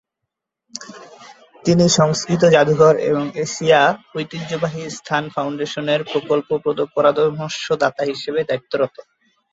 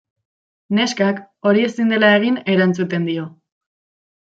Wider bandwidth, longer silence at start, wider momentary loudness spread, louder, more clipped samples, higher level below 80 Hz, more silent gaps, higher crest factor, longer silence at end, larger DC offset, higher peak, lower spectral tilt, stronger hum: about the same, 8 kHz vs 8 kHz; about the same, 0.75 s vs 0.7 s; first, 13 LU vs 9 LU; about the same, -18 LUFS vs -17 LUFS; neither; first, -58 dBFS vs -66 dBFS; neither; about the same, 18 dB vs 18 dB; second, 0.5 s vs 0.95 s; neither; about the same, 0 dBFS vs -2 dBFS; about the same, -5 dB/octave vs -5.5 dB/octave; neither